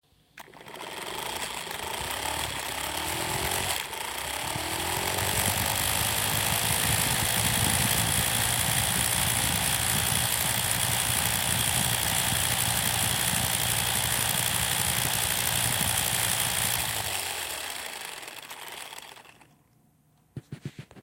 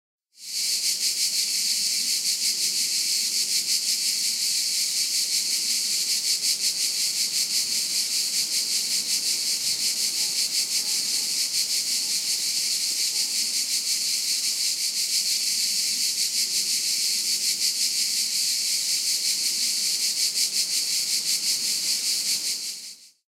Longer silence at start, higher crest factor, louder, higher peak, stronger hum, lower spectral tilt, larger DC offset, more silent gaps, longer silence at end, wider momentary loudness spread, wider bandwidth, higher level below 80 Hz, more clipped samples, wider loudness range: about the same, 0.35 s vs 0.4 s; about the same, 20 dB vs 16 dB; second, -25 LUFS vs -22 LUFS; about the same, -8 dBFS vs -8 dBFS; neither; first, -1.5 dB/octave vs 3 dB/octave; neither; neither; second, 0 s vs 0.25 s; first, 13 LU vs 1 LU; about the same, 17 kHz vs 16 kHz; first, -48 dBFS vs -80 dBFS; neither; first, 8 LU vs 1 LU